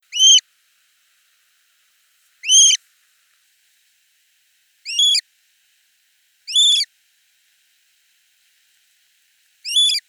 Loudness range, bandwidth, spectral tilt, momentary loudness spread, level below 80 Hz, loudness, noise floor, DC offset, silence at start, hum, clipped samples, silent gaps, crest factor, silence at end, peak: 6 LU; 19 kHz; 11.5 dB/octave; 17 LU; under -90 dBFS; -13 LUFS; -62 dBFS; under 0.1%; 0.15 s; none; under 0.1%; none; 20 dB; 0.1 s; -2 dBFS